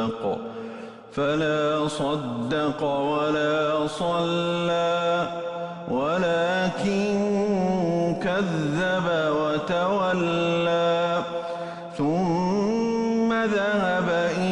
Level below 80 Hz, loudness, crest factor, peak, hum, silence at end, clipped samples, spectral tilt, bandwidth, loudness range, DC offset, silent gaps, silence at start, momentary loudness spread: -56 dBFS; -24 LUFS; 10 dB; -14 dBFS; none; 0 s; under 0.1%; -6 dB/octave; 11 kHz; 1 LU; under 0.1%; none; 0 s; 7 LU